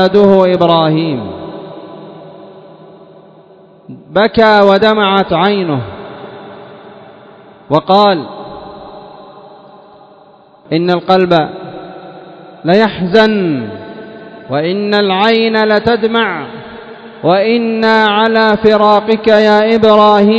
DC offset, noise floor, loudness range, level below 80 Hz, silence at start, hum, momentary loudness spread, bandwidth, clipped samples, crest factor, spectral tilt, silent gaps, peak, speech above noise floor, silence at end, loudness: under 0.1%; -42 dBFS; 6 LU; -48 dBFS; 0 s; none; 23 LU; 8 kHz; 0.7%; 12 dB; -7 dB/octave; none; 0 dBFS; 33 dB; 0 s; -10 LUFS